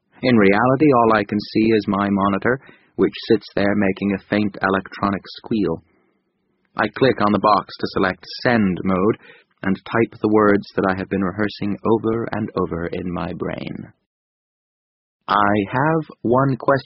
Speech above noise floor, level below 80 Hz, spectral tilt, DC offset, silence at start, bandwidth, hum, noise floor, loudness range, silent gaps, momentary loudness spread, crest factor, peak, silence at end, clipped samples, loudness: 49 dB; -50 dBFS; -5.5 dB/octave; under 0.1%; 0.2 s; 6 kHz; none; -68 dBFS; 6 LU; 14.06-15.20 s; 11 LU; 18 dB; -2 dBFS; 0.05 s; under 0.1%; -19 LUFS